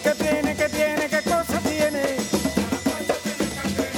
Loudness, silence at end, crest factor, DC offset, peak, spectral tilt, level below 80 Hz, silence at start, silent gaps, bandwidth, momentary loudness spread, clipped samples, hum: -23 LUFS; 0 s; 18 dB; under 0.1%; -6 dBFS; -4 dB/octave; -46 dBFS; 0 s; none; 19.5 kHz; 4 LU; under 0.1%; none